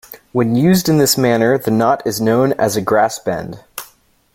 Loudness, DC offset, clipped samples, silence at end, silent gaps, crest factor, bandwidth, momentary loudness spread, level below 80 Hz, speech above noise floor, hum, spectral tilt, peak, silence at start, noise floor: -15 LUFS; under 0.1%; under 0.1%; 0.5 s; none; 14 dB; 16.5 kHz; 14 LU; -50 dBFS; 36 dB; none; -5 dB/octave; 0 dBFS; 0.1 s; -50 dBFS